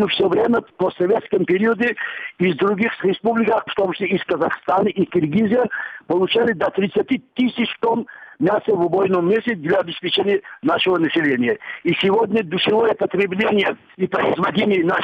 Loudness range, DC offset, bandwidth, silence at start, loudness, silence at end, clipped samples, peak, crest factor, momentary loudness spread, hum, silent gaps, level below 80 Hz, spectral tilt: 1 LU; under 0.1%; 5.8 kHz; 0 s; -19 LUFS; 0 s; under 0.1%; -6 dBFS; 12 dB; 5 LU; none; none; -60 dBFS; -7.5 dB/octave